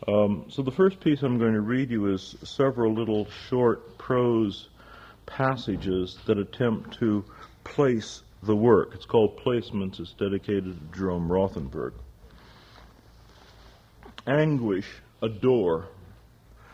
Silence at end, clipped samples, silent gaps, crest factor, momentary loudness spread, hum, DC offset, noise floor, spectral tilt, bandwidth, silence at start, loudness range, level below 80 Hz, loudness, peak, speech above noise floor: 0.65 s; under 0.1%; none; 20 dB; 12 LU; none; under 0.1%; -53 dBFS; -7.5 dB/octave; 8.2 kHz; 0 s; 6 LU; -52 dBFS; -26 LUFS; -8 dBFS; 28 dB